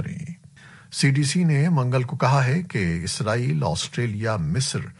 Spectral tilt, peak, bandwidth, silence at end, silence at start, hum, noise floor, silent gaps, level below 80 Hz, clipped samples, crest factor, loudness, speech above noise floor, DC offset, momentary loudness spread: -5.5 dB/octave; -8 dBFS; 11.5 kHz; 0.05 s; 0 s; none; -47 dBFS; none; -50 dBFS; under 0.1%; 16 dB; -22 LUFS; 26 dB; under 0.1%; 11 LU